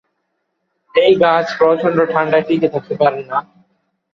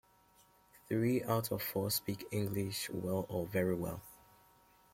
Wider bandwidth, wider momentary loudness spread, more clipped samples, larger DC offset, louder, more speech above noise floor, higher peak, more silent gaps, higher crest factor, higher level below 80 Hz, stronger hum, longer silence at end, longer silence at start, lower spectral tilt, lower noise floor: second, 6.6 kHz vs 16.5 kHz; about the same, 8 LU vs 6 LU; neither; neither; first, -15 LUFS vs -37 LUFS; first, 56 dB vs 31 dB; first, 0 dBFS vs -20 dBFS; neither; about the same, 16 dB vs 18 dB; first, -58 dBFS vs -66 dBFS; neither; about the same, 0.7 s vs 0.8 s; first, 0.95 s vs 0.75 s; about the same, -6.5 dB/octave vs -5.5 dB/octave; about the same, -70 dBFS vs -67 dBFS